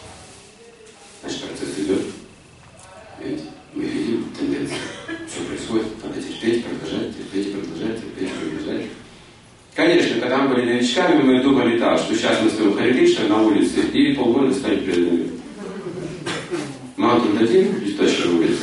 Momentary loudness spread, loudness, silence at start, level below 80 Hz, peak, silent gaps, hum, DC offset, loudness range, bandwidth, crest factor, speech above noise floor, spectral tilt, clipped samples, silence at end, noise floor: 15 LU; -20 LUFS; 0 s; -54 dBFS; -4 dBFS; none; none; under 0.1%; 11 LU; 11.5 kHz; 16 dB; 30 dB; -5 dB/octave; under 0.1%; 0 s; -47 dBFS